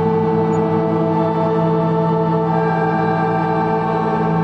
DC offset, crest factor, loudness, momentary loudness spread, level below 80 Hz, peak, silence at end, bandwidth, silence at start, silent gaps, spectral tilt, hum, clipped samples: under 0.1%; 12 dB; -17 LUFS; 1 LU; -48 dBFS; -4 dBFS; 0 s; 7.2 kHz; 0 s; none; -9.5 dB/octave; none; under 0.1%